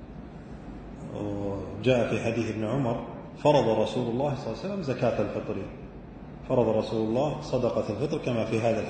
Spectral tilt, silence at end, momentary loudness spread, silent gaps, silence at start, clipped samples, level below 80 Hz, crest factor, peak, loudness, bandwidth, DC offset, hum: -7 dB/octave; 0 s; 18 LU; none; 0 s; under 0.1%; -50 dBFS; 20 dB; -8 dBFS; -28 LUFS; 9.2 kHz; under 0.1%; none